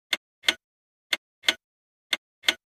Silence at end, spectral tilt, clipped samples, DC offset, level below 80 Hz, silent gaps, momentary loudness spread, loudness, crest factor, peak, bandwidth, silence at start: 0.15 s; 1.5 dB/octave; under 0.1%; under 0.1%; -72 dBFS; 0.17-0.42 s, 0.64-1.10 s, 1.18-1.42 s, 1.64-2.10 s, 2.18-2.42 s; 6 LU; -27 LUFS; 28 dB; -2 dBFS; 15.5 kHz; 0.1 s